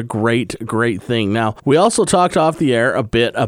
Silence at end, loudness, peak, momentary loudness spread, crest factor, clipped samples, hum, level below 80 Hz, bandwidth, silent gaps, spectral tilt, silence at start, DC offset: 0 s; -16 LUFS; 0 dBFS; 5 LU; 16 dB; under 0.1%; none; -46 dBFS; 15 kHz; none; -5 dB/octave; 0 s; under 0.1%